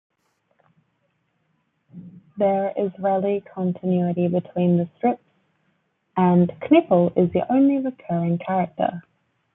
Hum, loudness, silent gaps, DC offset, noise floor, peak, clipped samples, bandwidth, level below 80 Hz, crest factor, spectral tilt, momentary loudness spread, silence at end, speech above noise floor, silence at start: none; -21 LUFS; none; under 0.1%; -70 dBFS; -4 dBFS; under 0.1%; 3.8 kHz; -66 dBFS; 18 dB; -12 dB/octave; 8 LU; 0.55 s; 50 dB; 1.95 s